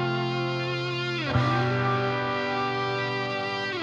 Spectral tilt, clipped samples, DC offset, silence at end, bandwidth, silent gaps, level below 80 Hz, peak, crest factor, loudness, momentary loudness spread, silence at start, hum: -6.5 dB/octave; under 0.1%; under 0.1%; 0 s; 7.4 kHz; none; -54 dBFS; -12 dBFS; 14 dB; -27 LUFS; 4 LU; 0 s; none